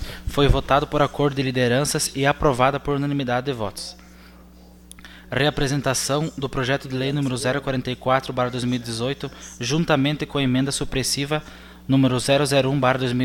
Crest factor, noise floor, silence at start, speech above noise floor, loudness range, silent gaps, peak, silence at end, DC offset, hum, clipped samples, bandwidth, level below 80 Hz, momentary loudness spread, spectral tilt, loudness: 20 dB; -46 dBFS; 0 s; 25 dB; 4 LU; none; -2 dBFS; 0 s; under 0.1%; none; under 0.1%; 17 kHz; -36 dBFS; 9 LU; -5 dB/octave; -22 LUFS